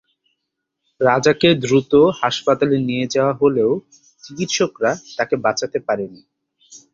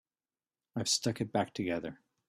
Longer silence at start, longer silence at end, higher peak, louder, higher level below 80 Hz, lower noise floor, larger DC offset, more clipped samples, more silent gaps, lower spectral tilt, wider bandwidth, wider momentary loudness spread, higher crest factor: first, 1 s vs 0.75 s; second, 0.15 s vs 0.35 s; first, -2 dBFS vs -16 dBFS; first, -18 LUFS vs -34 LUFS; first, -56 dBFS vs -70 dBFS; second, -78 dBFS vs under -90 dBFS; neither; neither; neither; first, -5 dB/octave vs -3.5 dB/octave; second, 7.6 kHz vs 14.5 kHz; about the same, 9 LU vs 11 LU; about the same, 18 dB vs 20 dB